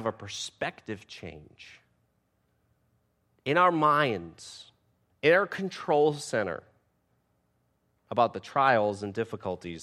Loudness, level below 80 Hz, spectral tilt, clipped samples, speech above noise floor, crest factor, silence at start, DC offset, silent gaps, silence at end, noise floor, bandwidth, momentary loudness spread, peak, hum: -27 LUFS; -68 dBFS; -5 dB/octave; under 0.1%; 45 dB; 22 dB; 0 s; under 0.1%; none; 0 s; -73 dBFS; 12.5 kHz; 20 LU; -8 dBFS; none